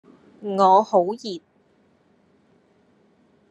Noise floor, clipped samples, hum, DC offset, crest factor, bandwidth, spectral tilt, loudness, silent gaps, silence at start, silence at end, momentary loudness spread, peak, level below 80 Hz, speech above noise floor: -61 dBFS; under 0.1%; none; under 0.1%; 20 dB; 9.6 kHz; -6.5 dB/octave; -20 LUFS; none; 0.4 s; 2.1 s; 20 LU; -4 dBFS; -82 dBFS; 42 dB